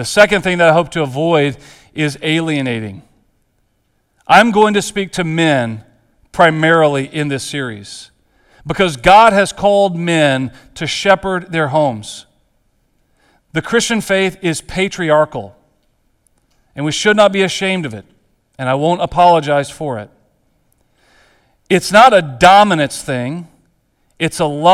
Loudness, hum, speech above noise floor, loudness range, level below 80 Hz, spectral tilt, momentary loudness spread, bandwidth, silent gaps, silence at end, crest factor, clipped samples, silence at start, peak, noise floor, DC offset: -13 LUFS; none; 49 dB; 6 LU; -44 dBFS; -4.5 dB/octave; 17 LU; 15 kHz; none; 0 s; 14 dB; 0.2%; 0 s; 0 dBFS; -62 dBFS; under 0.1%